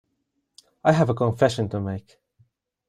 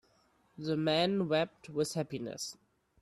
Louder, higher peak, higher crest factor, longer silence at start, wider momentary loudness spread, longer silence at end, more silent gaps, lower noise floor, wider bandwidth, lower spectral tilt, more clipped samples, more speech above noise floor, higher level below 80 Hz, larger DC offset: first, -23 LUFS vs -34 LUFS; first, -4 dBFS vs -18 dBFS; about the same, 20 dB vs 18 dB; first, 0.85 s vs 0.6 s; about the same, 11 LU vs 12 LU; first, 0.9 s vs 0.5 s; neither; first, -75 dBFS vs -70 dBFS; second, 12 kHz vs 14 kHz; first, -7 dB/octave vs -5 dB/octave; neither; first, 53 dB vs 37 dB; first, -58 dBFS vs -72 dBFS; neither